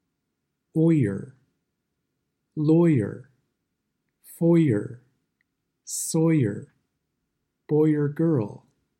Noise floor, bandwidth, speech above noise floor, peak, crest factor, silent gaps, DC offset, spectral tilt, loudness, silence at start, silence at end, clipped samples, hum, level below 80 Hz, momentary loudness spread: -79 dBFS; 15.5 kHz; 58 dB; -10 dBFS; 16 dB; none; under 0.1%; -7.5 dB/octave; -23 LUFS; 0.75 s; 0.45 s; under 0.1%; none; -70 dBFS; 16 LU